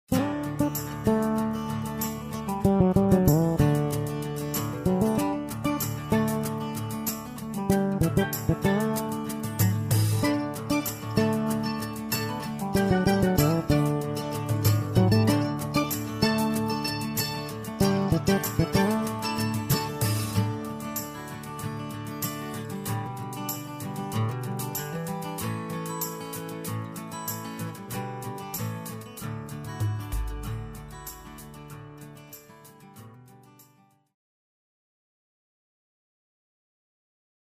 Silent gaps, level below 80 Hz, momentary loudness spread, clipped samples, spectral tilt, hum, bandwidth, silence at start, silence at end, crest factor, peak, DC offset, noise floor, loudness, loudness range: none; -46 dBFS; 13 LU; under 0.1%; -6 dB/octave; none; 15.5 kHz; 0.1 s; 3.85 s; 22 dB; -6 dBFS; under 0.1%; -61 dBFS; -27 LUFS; 10 LU